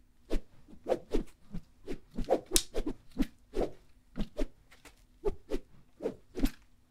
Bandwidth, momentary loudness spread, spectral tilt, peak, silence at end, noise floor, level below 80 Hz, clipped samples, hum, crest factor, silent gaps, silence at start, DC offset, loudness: 16 kHz; 17 LU; -3.5 dB/octave; 0 dBFS; 0.35 s; -58 dBFS; -40 dBFS; under 0.1%; none; 34 dB; none; 0.3 s; under 0.1%; -37 LUFS